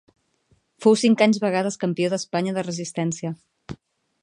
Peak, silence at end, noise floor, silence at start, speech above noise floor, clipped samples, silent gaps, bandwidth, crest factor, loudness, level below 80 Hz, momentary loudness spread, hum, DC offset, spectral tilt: -4 dBFS; 0.5 s; -65 dBFS; 0.8 s; 44 dB; under 0.1%; none; 10.5 kHz; 20 dB; -22 LUFS; -62 dBFS; 23 LU; none; under 0.1%; -5 dB/octave